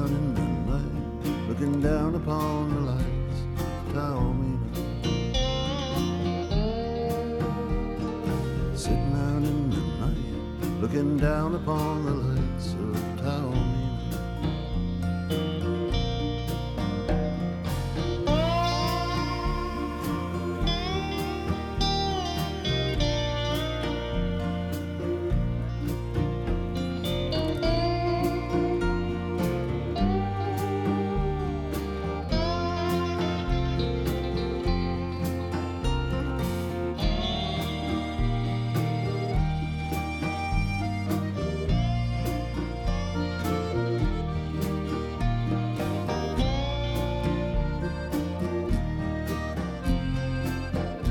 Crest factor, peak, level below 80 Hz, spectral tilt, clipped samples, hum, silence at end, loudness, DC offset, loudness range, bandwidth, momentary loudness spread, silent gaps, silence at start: 16 dB; -12 dBFS; -34 dBFS; -6.5 dB/octave; under 0.1%; none; 0 s; -28 LUFS; under 0.1%; 2 LU; 17.5 kHz; 5 LU; none; 0 s